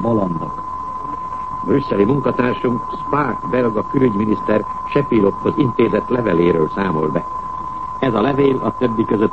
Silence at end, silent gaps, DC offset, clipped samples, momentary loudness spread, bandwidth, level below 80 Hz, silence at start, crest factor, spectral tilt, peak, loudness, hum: 0 s; none; 1%; under 0.1%; 10 LU; 8.2 kHz; -44 dBFS; 0 s; 16 dB; -9 dB/octave; -2 dBFS; -18 LUFS; none